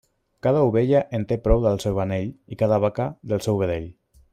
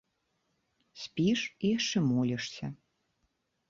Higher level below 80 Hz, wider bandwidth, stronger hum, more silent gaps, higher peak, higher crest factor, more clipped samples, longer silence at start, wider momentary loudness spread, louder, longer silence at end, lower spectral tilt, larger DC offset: first, -36 dBFS vs -68 dBFS; first, 15.5 kHz vs 7.6 kHz; neither; neither; first, -4 dBFS vs -18 dBFS; about the same, 18 dB vs 16 dB; neither; second, 0.45 s vs 0.95 s; second, 10 LU vs 13 LU; first, -23 LUFS vs -31 LUFS; second, 0.4 s vs 0.95 s; first, -7.5 dB/octave vs -5 dB/octave; neither